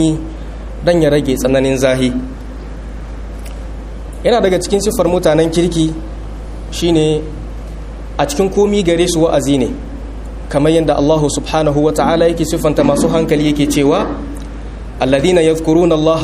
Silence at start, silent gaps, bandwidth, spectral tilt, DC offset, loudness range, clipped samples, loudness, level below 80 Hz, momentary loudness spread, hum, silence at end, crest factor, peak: 0 s; none; 15.5 kHz; -5.5 dB/octave; under 0.1%; 4 LU; under 0.1%; -13 LUFS; -26 dBFS; 17 LU; none; 0 s; 14 dB; 0 dBFS